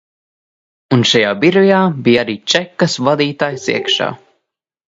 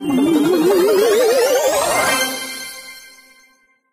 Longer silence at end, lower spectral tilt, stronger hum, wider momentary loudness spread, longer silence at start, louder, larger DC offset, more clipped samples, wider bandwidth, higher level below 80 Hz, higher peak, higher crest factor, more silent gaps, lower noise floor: second, 0.75 s vs 0.95 s; first, -4.5 dB/octave vs -3 dB/octave; neither; second, 6 LU vs 15 LU; first, 0.9 s vs 0 s; about the same, -14 LUFS vs -15 LUFS; neither; neither; second, 8 kHz vs 15.5 kHz; about the same, -58 dBFS vs -54 dBFS; first, 0 dBFS vs -4 dBFS; about the same, 16 dB vs 14 dB; neither; first, -75 dBFS vs -56 dBFS